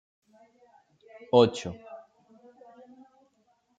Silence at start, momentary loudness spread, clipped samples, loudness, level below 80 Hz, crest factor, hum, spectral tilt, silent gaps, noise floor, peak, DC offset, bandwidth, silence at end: 1.35 s; 26 LU; under 0.1%; -25 LUFS; -70 dBFS; 26 dB; none; -6 dB/octave; none; -70 dBFS; -6 dBFS; under 0.1%; 9.2 kHz; 1.8 s